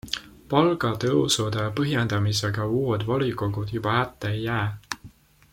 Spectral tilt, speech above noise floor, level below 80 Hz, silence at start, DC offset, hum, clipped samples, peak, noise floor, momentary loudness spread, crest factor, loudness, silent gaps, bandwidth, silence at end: -5 dB/octave; 26 dB; -52 dBFS; 0.05 s; under 0.1%; none; under 0.1%; -4 dBFS; -50 dBFS; 9 LU; 22 dB; -25 LUFS; none; 16.5 kHz; 0.45 s